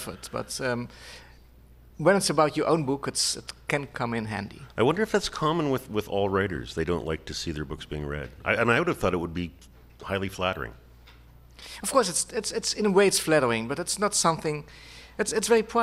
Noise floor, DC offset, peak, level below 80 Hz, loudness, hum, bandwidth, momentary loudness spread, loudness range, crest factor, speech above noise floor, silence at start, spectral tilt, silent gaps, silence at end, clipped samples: -52 dBFS; under 0.1%; -6 dBFS; -50 dBFS; -26 LUFS; none; 15.5 kHz; 13 LU; 5 LU; 20 dB; 26 dB; 0 s; -4 dB/octave; none; 0 s; under 0.1%